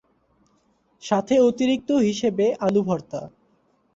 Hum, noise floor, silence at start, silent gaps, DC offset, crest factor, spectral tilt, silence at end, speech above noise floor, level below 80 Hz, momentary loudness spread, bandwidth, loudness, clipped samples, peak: none; -64 dBFS; 1.05 s; none; under 0.1%; 18 dB; -6 dB/octave; 0.7 s; 43 dB; -62 dBFS; 16 LU; 8 kHz; -21 LUFS; under 0.1%; -6 dBFS